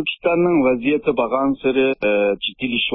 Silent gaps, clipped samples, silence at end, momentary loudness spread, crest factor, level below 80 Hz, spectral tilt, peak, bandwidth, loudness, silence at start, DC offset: none; under 0.1%; 0 s; 4 LU; 12 dB; -52 dBFS; -10.5 dB/octave; -6 dBFS; 4 kHz; -18 LUFS; 0 s; under 0.1%